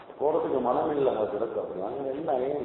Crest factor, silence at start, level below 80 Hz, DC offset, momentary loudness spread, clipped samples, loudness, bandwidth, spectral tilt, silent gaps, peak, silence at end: 16 dB; 0 s; -62 dBFS; under 0.1%; 6 LU; under 0.1%; -28 LUFS; 4.1 kHz; -10.5 dB/octave; none; -12 dBFS; 0 s